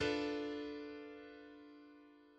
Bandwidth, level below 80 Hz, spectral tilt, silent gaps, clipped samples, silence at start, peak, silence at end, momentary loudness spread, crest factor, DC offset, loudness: 9 kHz; -70 dBFS; -5 dB/octave; none; under 0.1%; 0 s; -26 dBFS; 0 s; 20 LU; 18 dB; under 0.1%; -44 LUFS